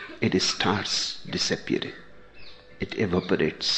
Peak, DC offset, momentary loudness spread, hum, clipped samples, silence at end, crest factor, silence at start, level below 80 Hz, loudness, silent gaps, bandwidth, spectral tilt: -8 dBFS; under 0.1%; 11 LU; none; under 0.1%; 0 s; 20 dB; 0 s; -54 dBFS; -26 LUFS; none; 9.2 kHz; -3.5 dB/octave